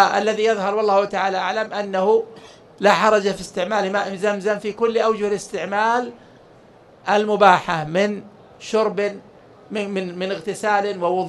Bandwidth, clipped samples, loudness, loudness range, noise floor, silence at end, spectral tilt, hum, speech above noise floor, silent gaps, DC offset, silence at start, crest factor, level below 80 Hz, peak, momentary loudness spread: 12 kHz; under 0.1%; -20 LUFS; 3 LU; -48 dBFS; 0 s; -4.5 dB/octave; none; 29 dB; none; under 0.1%; 0 s; 20 dB; -60 dBFS; 0 dBFS; 10 LU